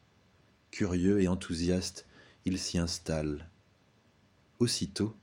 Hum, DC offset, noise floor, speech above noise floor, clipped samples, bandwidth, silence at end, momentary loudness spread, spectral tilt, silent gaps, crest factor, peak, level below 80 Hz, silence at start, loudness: none; under 0.1%; -66 dBFS; 35 dB; under 0.1%; 16 kHz; 0.1 s; 12 LU; -5 dB/octave; none; 18 dB; -16 dBFS; -52 dBFS; 0.75 s; -32 LUFS